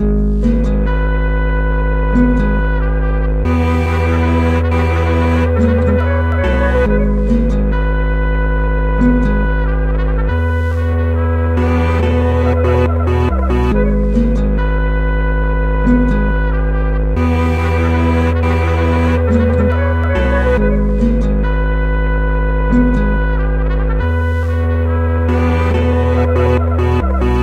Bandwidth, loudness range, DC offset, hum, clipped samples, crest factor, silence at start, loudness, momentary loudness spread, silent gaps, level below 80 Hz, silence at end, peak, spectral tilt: 6.2 kHz; 2 LU; under 0.1%; none; under 0.1%; 12 dB; 0 s; -15 LUFS; 3 LU; none; -16 dBFS; 0 s; 0 dBFS; -8.5 dB/octave